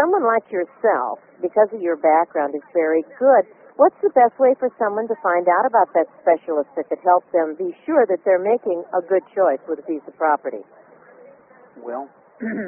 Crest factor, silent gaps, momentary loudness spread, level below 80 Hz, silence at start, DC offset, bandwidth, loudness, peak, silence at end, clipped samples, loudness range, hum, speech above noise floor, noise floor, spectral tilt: 16 dB; none; 12 LU; -74 dBFS; 0 s; under 0.1%; 3.1 kHz; -19 LUFS; -2 dBFS; 0 s; under 0.1%; 6 LU; none; 29 dB; -48 dBFS; 1 dB/octave